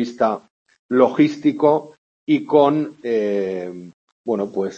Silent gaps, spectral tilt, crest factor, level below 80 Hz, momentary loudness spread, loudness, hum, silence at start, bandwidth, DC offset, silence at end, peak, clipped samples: 0.50-0.66 s, 0.79-0.89 s, 1.98-2.27 s, 3.94-4.24 s; -7.5 dB/octave; 18 dB; -70 dBFS; 15 LU; -19 LUFS; none; 0 s; 7.4 kHz; under 0.1%; 0 s; -2 dBFS; under 0.1%